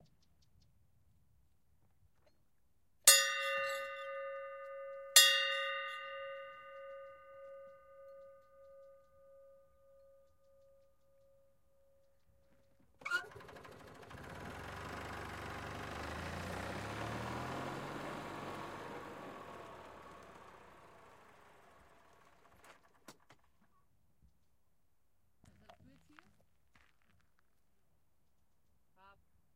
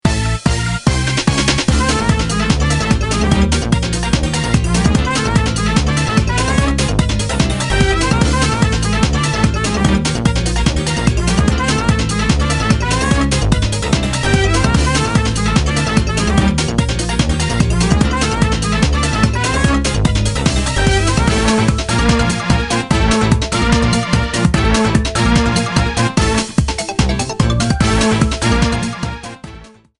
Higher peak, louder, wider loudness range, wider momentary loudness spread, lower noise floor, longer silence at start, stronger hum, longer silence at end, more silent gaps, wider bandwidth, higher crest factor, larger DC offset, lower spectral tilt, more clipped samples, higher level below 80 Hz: second, -8 dBFS vs 0 dBFS; second, -34 LUFS vs -15 LUFS; first, 24 LU vs 1 LU; first, 28 LU vs 3 LU; first, -81 dBFS vs -37 dBFS; first, 3.05 s vs 0.05 s; neither; first, 0.45 s vs 0.3 s; neither; first, 16 kHz vs 11.5 kHz; first, 34 dB vs 14 dB; neither; second, -0.5 dB/octave vs -5 dB/octave; neither; second, -66 dBFS vs -20 dBFS